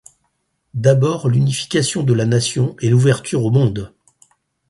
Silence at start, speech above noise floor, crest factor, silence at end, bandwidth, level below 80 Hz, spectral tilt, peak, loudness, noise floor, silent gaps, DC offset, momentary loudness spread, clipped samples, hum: 0.75 s; 53 dB; 16 dB; 0.85 s; 11.5 kHz; -50 dBFS; -6 dB/octave; 0 dBFS; -16 LUFS; -68 dBFS; none; under 0.1%; 5 LU; under 0.1%; none